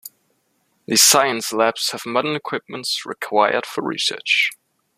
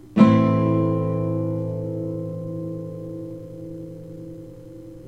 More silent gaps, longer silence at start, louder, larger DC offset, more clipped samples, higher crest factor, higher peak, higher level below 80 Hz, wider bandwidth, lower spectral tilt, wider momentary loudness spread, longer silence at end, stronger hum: neither; about the same, 0.05 s vs 0.05 s; first, -18 LUFS vs -22 LUFS; second, under 0.1% vs 0.2%; neither; about the same, 20 dB vs 20 dB; about the same, 0 dBFS vs -2 dBFS; second, -68 dBFS vs -52 dBFS; first, 15.5 kHz vs 7.6 kHz; second, -1 dB/octave vs -9.5 dB/octave; second, 13 LU vs 22 LU; first, 0.45 s vs 0 s; neither